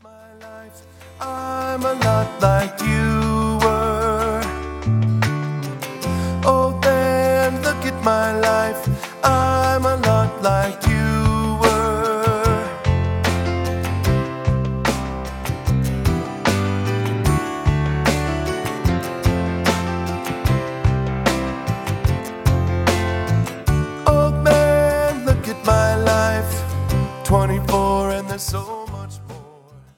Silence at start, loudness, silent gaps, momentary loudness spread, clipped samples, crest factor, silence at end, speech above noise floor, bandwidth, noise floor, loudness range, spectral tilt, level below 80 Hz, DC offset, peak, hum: 0.05 s; -19 LUFS; none; 8 LU; under 0.1%; 18 dB; 0.15 s; 26 dB; 17.5 kHz; -45 dBFS; 4 LU; -6 dB/octave; -30 dBFS; under 0.1%; 0 dBFS; none